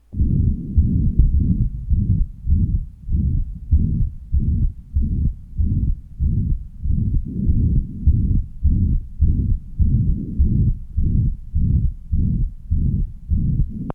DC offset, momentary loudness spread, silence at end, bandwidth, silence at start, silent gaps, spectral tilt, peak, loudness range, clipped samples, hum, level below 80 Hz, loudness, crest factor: under 0.1%; 6 LU; 0 s; 1.3 kHz; 0.1 s; none; -13.5 dB/octave; 0 dBFS; 2 LU; under 0.1%; none; -20 dBFS; -22 LUFS; 18 dB